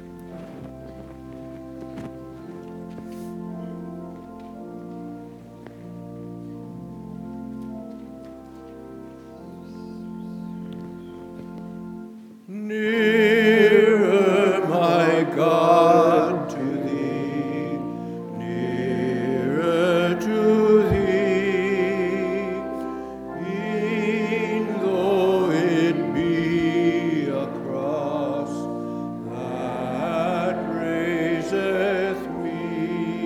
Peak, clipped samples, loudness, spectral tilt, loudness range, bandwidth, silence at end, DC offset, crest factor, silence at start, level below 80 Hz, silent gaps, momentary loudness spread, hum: -4 dBFS; under 0.1%; -22 LUFS; -6.5 dB/octave; 19 LU; 15 kHz; 0 s; under 0.1%; 20 dB; 0 s; -52 dBFS; none; 22 LU; none